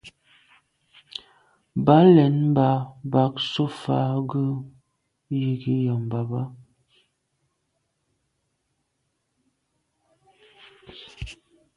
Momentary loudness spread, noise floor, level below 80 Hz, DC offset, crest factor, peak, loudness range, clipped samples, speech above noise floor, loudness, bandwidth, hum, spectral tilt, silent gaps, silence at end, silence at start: 23 LU; -75 dBFS; -56 dBFS; under 0.1%; 22 dB; -2 dBFS; 12 LU; under 0.1%; 55 dB; -22 LUFS; 10.5 kHz; none; -8.5 dB/octave; none; 0.45 s; 0.05 s